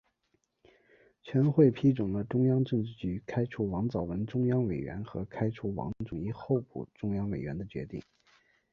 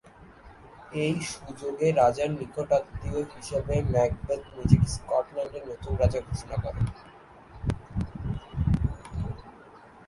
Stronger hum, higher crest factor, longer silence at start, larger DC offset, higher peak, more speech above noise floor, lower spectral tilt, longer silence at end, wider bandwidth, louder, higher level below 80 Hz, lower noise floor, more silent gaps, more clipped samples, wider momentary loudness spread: neither; about the same, 20 dB vs 24 dB; first, 1.25 s vs 0.05 s; neither; second, -10 dBFS vs -4 dBFS; first, 46 dB vs 24 dB; first, -10 dB/octave vs -7 dB/octave; first, 0.7 s vs 0.05 s; second, 6.4 kHz vs 11.5 kHz; about the same, -31 LUFS vs -29 LUFS; second, -56 dBFS vs -38 dBFS; first, -77 dBFS vs -51 dBFS; neither; neither; about the same, 13 LU vs 13 LU